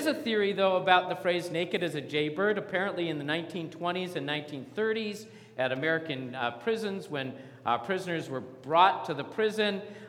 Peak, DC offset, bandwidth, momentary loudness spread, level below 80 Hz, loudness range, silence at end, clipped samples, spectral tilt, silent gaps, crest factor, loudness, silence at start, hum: -8 dBFS; under 0.1%; 16.5 kHz; 12 LU; -82 dBFS; 4 LU; 0 s; under 0.1%; -5 dB/octave; none; 22 dB; -30 LUFS; 0 s; none